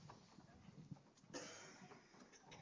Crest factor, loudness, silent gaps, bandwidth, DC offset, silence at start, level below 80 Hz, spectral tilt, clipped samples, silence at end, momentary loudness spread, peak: 20 dB; -59 LUFS; none; 8 kHz; under 0.1%; 0 s; -82 dBFS; -3.5 dB/octave; under 0.1%; 0 s; 11 LU; -40 dBFS